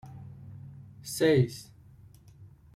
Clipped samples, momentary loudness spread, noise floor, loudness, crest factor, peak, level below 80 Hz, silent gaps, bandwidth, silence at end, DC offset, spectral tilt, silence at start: under 0.1%; 23 LU; -54 dBFS; -27 LUFS; 20 dB; -12 dBFS; -60 dBFS; none; 15.5 kHz; 0.3 s; under 0.1%; -6 dB/octave; 0.05 s